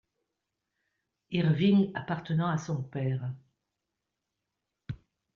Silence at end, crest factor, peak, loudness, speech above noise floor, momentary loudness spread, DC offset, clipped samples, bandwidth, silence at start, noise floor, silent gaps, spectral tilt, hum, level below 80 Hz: 0.4 s; 18 dB; -14 dBFS; -29 LUFS; 58 dB; 20 LU; under 0.1%; under 0.1%; 7.2 kHz; 1.3 s; -86 dBFS; none; -7 dB/octave; none; -66 dBFS